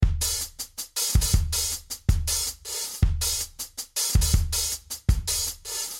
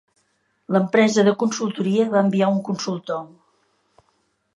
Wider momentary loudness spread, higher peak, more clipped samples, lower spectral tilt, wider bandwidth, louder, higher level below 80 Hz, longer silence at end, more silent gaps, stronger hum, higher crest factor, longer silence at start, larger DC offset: about the same, 8 LU vs 10 LU; second, -8 dBFS vs -4 dBFS; neither; second, -2.5 dB/octave vs -5.5 dB/octave; first, 17 kHz vs 10.5 kHz; second, -26 LUFS vs -20 LUFS; first, -28 dBFS vs -72 dBFS; second, 0 s vs 1.3 s; neither; neither; about the same, 18 dB vs 18 dB; second, 0 s vs 0.7 s; neither